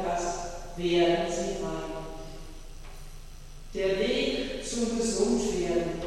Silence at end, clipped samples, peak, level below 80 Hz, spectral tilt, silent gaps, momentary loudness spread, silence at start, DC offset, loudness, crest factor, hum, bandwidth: 0 s; under 0.1%; -14 dBFS; -42 dBFS; -4 dB/octave; none; 22 LU; 0 s; under 0.1%; -29 LUFS; 16 dB; none; 13.5 kHz